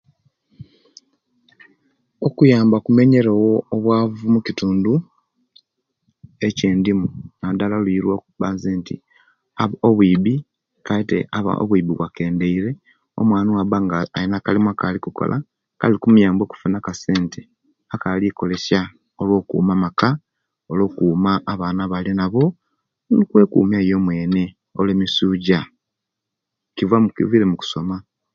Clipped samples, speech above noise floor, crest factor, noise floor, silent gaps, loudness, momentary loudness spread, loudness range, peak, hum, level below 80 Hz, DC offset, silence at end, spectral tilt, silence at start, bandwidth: under 0.1%; 64 dB; 18 dB; -82 dBFS; none; -19 LUFS; 12 LU; 5 LU; 0 dBFS; none; -48 dBFS; under 0.1%; 0.35 s; -7.5 dB/octave; 0.6 s; 7.2 kHz